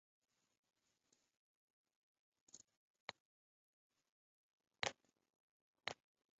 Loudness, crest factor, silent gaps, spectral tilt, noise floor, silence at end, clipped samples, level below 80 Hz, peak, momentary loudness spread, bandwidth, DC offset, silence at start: -50 LUFS; 36 dB; 2.77-2.94 s, 3.00-3.08 s, 3.20-3.90 s, 4.12-4.58 s, 5.40-5.74 s; 0.5 dB/octave; -84 dBFS; 0.45 s; under 0.1%; -88 dBFS; -22 dBFS; 18 LU; 7.6 kHz; under 0.1%; 2.55 s